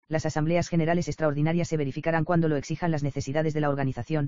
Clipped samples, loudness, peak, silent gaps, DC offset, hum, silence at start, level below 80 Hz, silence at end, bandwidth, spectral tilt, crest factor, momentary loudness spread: under 0.1%; -27 LUFS; -10 dBFS; none; 1%; none; 0 s; -50 dBFS; 0 s; 7.6 kHz; -7 dB/octave; 16 dB; 4 LU